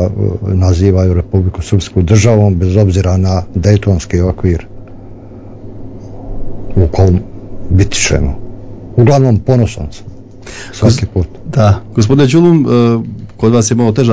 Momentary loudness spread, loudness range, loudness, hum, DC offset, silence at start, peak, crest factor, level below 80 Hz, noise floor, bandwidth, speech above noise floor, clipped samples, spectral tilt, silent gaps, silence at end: 21 LU; 6 LU; -11 LUFS; none; under 0.1%; 0 s; 0 dBFS; 10 dB; -22 dBFS; -30 dBFS; 8 kHz; 20 dB; 1%; -6.5 dB/octave; none; 0 s